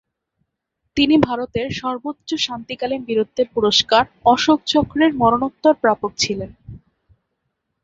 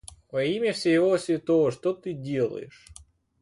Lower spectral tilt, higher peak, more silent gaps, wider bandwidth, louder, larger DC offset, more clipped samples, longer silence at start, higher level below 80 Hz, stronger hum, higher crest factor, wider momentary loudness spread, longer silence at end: second, -4 dB/octave vs -6 dB/octave; first, -2 dBFS vs -12 dBFS; neither; second, 7.8 kHz vs 11.5 kHz; first, -18 LUFS vs -26 LUFS; neither; neither; first, 0.95 s vs 0.35 s; first, -48 dBFS vs -60 dBFS; neither; about the same, 18 dB vs 14 dB; about the same, 10 LU vs 11 LU; first, 1.05 s vs 0.5 s